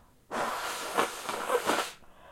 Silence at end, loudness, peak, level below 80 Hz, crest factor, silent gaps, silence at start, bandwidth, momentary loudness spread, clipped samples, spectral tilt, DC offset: 0 s; -32 LUFS; -10 dBFS; -64 dBFS; 24 dB; none; 0.3 s; 16.5 kHz; 10 LU; under 0.1%; -1.5 dB/octave; under 0.1%